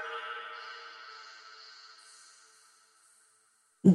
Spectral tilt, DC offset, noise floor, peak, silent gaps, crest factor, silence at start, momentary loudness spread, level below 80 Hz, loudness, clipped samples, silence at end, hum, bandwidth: -7.5 dB/octave; under 0.1%; -69 dBFS; -10 dBFS; none; 24 dB; 0 s; 19 LU; -78 dBFS; -38 LUFS; under 0.1%; 0 s; none; 11 kHz